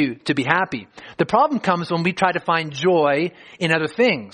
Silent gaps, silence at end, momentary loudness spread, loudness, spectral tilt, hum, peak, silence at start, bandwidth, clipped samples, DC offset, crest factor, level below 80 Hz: none; 0.05 s; 8 LU; -20 LUFS; -6 dB/octave; none; 0 dBFS; 0 s; 10 kHz; under 0.1%; under 0.1%; 20 dB; -62 dBFS